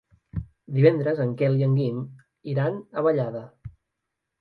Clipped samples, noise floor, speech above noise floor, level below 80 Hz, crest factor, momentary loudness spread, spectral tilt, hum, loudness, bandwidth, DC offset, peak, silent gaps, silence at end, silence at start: under 0.1%; -82 dBFS; 59 dB; -52 dBFS; 20 dB; 17 LU; -11 dB/octave; none; -24 LUFS; 4.8 kHz; under 0.1%; -4 dBFS; none; 0.7 s; 0.35 s